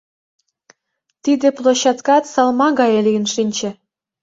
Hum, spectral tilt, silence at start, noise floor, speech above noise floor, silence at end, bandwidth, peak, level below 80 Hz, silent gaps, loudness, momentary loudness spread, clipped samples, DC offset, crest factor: none; -4 dB/octave; 1.25 s; -73 dBFS; 58 dB; 0.5 s; 8 kHz; -2 dBFS; -64 dBFS; none; -16 LUFS; 8 LU; under 0.1%; under 0.1%; 16 dB